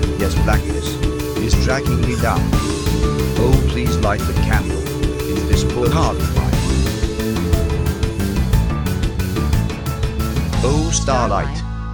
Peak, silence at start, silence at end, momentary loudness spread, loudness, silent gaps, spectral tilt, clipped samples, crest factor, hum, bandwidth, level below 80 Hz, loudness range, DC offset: 0 dBFS; 0 s; 0 s; 5 LU; -18 LUFS; none; -5.5 dB/octave; under 0.1%; 16 dB; none; over 20 kHz; -22 dBFS; 2 LU; under 0.1%